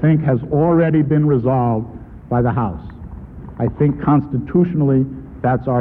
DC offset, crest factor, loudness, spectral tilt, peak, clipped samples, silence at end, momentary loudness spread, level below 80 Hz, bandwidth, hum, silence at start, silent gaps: under 0.1%; 14 dB; -17 LUFS; -12.5 dB/octave; -4 dBFS; under 0.1%; 0 s; 19 LU; -38 dBFS; 3.5 kHz; none; 0 s; none